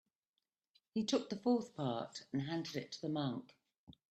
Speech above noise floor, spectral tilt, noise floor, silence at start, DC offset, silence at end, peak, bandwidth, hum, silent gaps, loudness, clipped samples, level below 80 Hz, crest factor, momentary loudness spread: over 51 dB; -5.5 dB/octave; under -90 dBFS; 0.95 s; under 0.1%; 0.2 s; -22 dBFS; 12.5 kHz; none; 3.78-3.87 s; -40 LUFS; under 0.1%; -80 dBFS; 18 dB; 8 LU